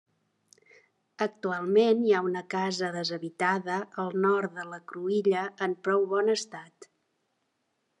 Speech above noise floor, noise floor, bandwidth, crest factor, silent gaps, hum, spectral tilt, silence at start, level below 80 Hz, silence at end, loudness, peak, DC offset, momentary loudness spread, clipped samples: 49 dB; -77 dBFS; 10.5 kHz; 18 dB; none; none; -5 dB/octave; 1.2 s; -86 dBFS; 1.15 s; -28 LUFS; -12 dBFS; under 0.1%; 10 LU; under 0.1%